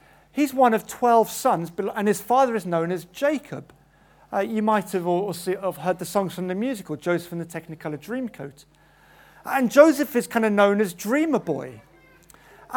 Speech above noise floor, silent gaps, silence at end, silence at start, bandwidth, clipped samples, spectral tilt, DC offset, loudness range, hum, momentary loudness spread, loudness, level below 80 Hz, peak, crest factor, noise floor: 33 dB; none; 0 s; 0.35 s; 19 kHz; under 0.1%; -5.5 dB/octave; under 0.1%; 7 LU; none; 15 LU; -23 LUFS; -64 dBFS; 0 dBFS; 24 dB; -56 dBFS